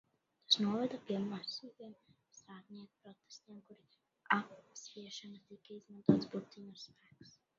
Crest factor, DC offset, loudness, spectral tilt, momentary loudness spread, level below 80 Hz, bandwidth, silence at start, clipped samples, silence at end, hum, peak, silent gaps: 28 dB; under 0.1%; -37 LUFS; -3.5 dB/octave; 24 LU; -78 dBFS; 7.4 kHz; 0.5 s; under 0.1%; 0.3 s; none; -14 dBFS; none